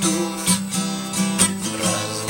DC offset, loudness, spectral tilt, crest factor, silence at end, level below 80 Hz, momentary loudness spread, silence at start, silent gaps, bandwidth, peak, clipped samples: under 0.1%; -20 LUFS; -3 dB/octave; 20 dB; 0 s; -54 dBFS; 6 LU; 0 s; none; 17 kHz; -2 dBFS; under 0.1%